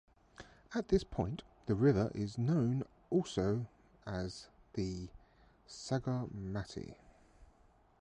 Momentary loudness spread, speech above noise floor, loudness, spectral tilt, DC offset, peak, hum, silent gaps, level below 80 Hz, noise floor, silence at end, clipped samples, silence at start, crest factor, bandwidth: 20 LU; 32 dB; -37 LUFS; -7 dB/octave; under 0.1%; -18 dBFS; none; none; -56 dBFS; -67 dBFS; 0.55 s; under 0.1%; 0.4 s; 20 dB; 10.5 kHz